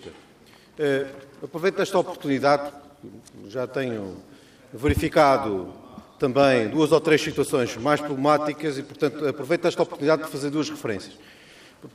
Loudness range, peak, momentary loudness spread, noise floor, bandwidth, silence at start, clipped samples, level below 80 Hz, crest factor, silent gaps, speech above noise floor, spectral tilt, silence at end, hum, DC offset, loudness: 5 LU; -4 dBFS; 18 LU; -52 dBFS; 15.5 kHz; 0 s; under 0.1%; -50 dBFS; 20 dB; none; 29 dB; -5.5 dB/octave; 0.05 s; none; under 0.1%; -23 LUFS